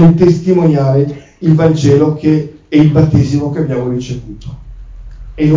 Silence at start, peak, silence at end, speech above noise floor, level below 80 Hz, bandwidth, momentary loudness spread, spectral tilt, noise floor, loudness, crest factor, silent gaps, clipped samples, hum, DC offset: 0 s; 0 dBFS; 0 s; 19 dB; -32 dBFS; 7.6 kHz; 13 LU; -8.5 dB/octave; -29 dBFS; -11 LUFS; 10 dB; none; under 0.1%; none; under 0.1%